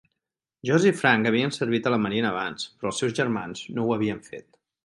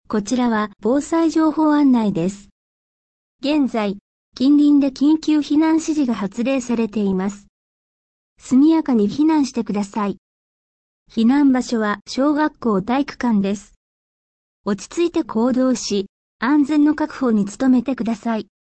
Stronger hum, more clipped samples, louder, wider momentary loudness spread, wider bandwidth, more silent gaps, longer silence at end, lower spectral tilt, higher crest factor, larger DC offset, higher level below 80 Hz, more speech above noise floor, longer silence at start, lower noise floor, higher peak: neither; neither; second, -25 LUFS vs -19 LUFS; about the same, 12 LU vs 10 LU; first, 11.5 kHz vs 8.8 kHz; second, none vs 2.52-3.39 s, 4.01-4.32 s, 7.49-8.36 s, 10.18-11.06 s, 13.77-14.64 s, 16.09-16.39 s; first, 0.45 s vs 0.3 s; about the same, -5 dB/octave vs -6 dB/octave; first, 22 dB vs 12 dB; neither; second, -64 dBFS vs -54 dBFS; second, 62 dB vs over 72 dB; first, 0.65 s vs 0.1 s; second, -86 dBFS vs under -90 dBFS; about the same, -4 dBFS vs -6 dBFS